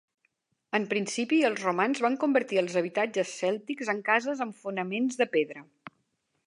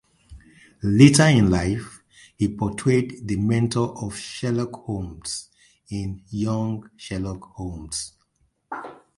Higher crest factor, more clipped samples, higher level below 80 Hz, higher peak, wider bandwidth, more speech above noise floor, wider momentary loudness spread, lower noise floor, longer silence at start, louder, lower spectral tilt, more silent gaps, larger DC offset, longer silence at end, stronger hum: about the same, 20 dB vs 22 dB; neither; second, -84 dBFS vs -44 dBFS; second, -10 dBFS vs 0 dBFS; about the same, 11.5 kHz vs 11.5 kHz; about the same, 49 dB vs 46 dB; second, 8 LU vs 19 LU; first, -76 dBFS vs -68 dBFS; first, 0.75 s vs 0.3 s; second, -28 LUFS vs -22 LUFS; about the same, -4.5 dB/octave vs -5.5 dB/octave; neither; neither; first, 0.85 s vs 0.25 s; neither